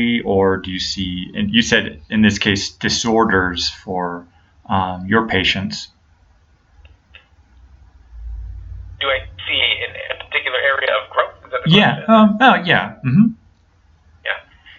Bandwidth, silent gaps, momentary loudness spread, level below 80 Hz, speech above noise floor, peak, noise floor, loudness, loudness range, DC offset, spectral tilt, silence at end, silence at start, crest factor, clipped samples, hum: 7.8 kHz; none; 15 LU; -42 dBFS; 37 dB; 0 dBFS; -53 dBFS; -17 LUFS; 9 LU; under 0.1%; -4.5 dB/octave; 0.4 s; 0 s; 18 dB; under 0.1%; none